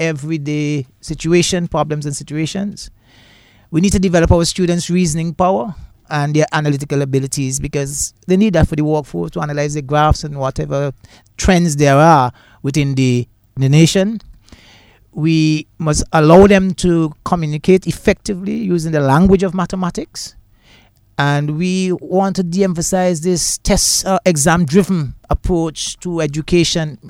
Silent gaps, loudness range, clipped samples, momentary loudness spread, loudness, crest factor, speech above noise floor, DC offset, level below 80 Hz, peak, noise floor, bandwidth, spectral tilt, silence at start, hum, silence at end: none; 4 LU; under 0.1%; 10 LU; -15 LUFS; 14 dB; 34 dB; under 0.1%; -30 dBFS; 0 dBFS; -49 dBFS; 16 kHz; -5.5 dB/octave; 0 s; none; 0 s